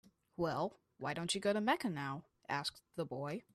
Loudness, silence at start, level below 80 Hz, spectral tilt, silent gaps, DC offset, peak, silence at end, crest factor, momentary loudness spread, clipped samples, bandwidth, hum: -39 LUFS; 0.4 s; -74 dBFS; -4.5 dB/octave; none; under 0.1%; -20 dBFS; 0.15 s; 20 dB; 11 LU; under 0.1%; 14 kHz; none